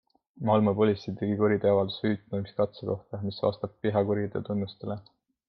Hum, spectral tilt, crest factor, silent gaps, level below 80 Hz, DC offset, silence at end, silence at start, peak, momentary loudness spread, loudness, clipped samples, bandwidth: none; -9.5 dB/octave; 18 dB; none; -66 dBFS; under 0.1%; 0.45 s; 0.35 s; -10 dBFS; 10 LU; -28 LUFS; under 0.1%; 6 kHz